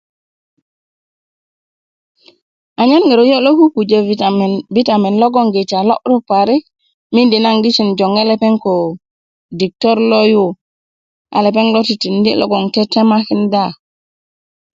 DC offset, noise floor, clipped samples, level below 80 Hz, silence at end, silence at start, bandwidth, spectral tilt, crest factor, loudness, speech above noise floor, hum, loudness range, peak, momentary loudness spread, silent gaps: under 0.1%; under -90 dBFS; under 0.1%; -60 dBFS; 1 s; 2.8 s; 7.6 kHz; -6.5 dB/octave; 14 dB; -12 LUFS; over 79 dB; none; 3 LU; 0 dBFS; 7 LU; 6.94-7.10 s, 9.11-9.49 s, 10.61-11.25 s